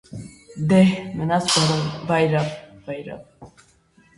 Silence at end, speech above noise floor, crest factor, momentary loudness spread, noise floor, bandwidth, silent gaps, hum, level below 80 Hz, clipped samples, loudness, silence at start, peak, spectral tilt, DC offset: 0.7 s; 36 dB; 18 dB; 22 LU; -57 dBFS; 11.5 kHz; none; none; -54 dBFS; under 0.1%; -20 LUFS; 0.1 s; -4 dBFS; -5 dB/octave; under 0.1%